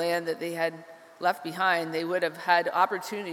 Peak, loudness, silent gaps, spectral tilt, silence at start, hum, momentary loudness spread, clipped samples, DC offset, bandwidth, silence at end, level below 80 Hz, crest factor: -8 dBFS; -27 LUFS; none; -4 dB/octave; 0 s; none; 7 LU; under 0.1%; under 0.1%; 17.5 kHz; 0 s; -84 dBFS; 20 dB